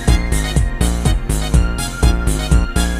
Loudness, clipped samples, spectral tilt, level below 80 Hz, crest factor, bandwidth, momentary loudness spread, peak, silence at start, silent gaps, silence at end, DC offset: -17 LUFS; under 0.1%; -5 dB/octave; -16 dBFS; 14 dB; 16 kHz; 3 LU; 0 dBFS; 0 s; none; 0 s; under 0.1%